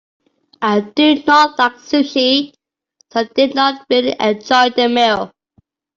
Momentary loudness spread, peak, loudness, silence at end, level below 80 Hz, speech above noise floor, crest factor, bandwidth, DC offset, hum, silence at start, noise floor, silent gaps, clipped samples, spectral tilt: 10 LU; -2 dBFS; -14 LUFS; 0.7 s; -60 dBFS; 46 dB; 14 dB; 7.6 kHz; under 0.1%; none; 0.6 s; -60 dBFS; none; under 0.1%; -4 dB/octave